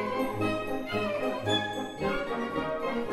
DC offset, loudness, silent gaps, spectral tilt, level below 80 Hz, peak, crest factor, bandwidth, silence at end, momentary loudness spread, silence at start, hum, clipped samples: under 0.1%; -31 LUFS; none; -5 dB/octave; -52 dBFS; -16 dBFS; 16 dB; 16 kHz; 0 s; 4 LU; 0 s; none; under 0.1%